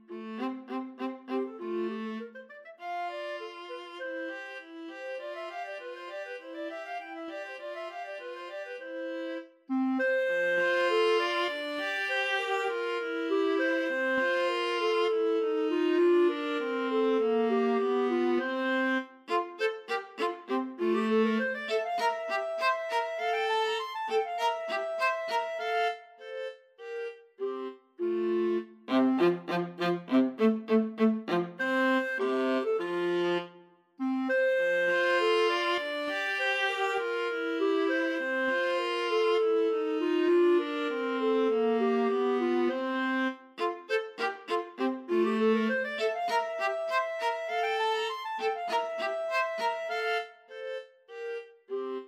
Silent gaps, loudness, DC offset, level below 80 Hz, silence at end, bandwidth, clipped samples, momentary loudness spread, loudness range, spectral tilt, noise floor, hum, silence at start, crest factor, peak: none; -30 LUFS; under 0.1%; -88 dBFS; 0 s; 13.5 kHz; under 0.1%; 13 LU; 11 LU; -5 dB/octave; -57 dBFS; none; 0.1 s; 16 dB; -14 dBFS